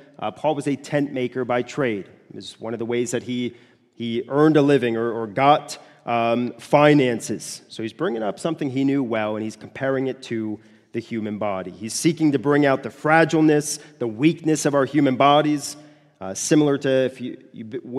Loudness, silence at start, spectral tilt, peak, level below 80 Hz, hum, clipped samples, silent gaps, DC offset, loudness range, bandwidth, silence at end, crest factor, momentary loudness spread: -21 LUFS; 0.2 s; -5.5 dB/octave; 0 dBFS; -68 dBFS; none; under 0.1%; none; under 0.1%; 6 LU; 13.5 kHz; 0 s; 22 dB; 16 LU